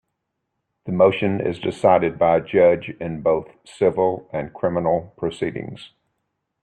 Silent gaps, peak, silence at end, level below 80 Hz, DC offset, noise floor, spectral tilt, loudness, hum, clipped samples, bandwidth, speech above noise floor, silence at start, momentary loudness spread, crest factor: none; -4 dBFS; 0.75 s; -56 dBFS; under 0.1%; -77 dBFS; -7.5 dB/octave; -20 LUFS; none; under 0.1%; 9.2 kHz; 57 dB; 0.85 s; 13 LU; 18 dB